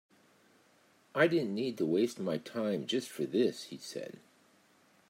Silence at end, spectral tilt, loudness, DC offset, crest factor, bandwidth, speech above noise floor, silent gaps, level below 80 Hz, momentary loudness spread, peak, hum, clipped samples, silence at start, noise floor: 1 s; -5 dB/octave; -33 LUFS; under 0.1%; 22 dB; 16 kHz; 34 dB; none; -84 dBFS; 14 LU; -14 dBFS; none; under 0.1%; 1.15 s; -67 dBFS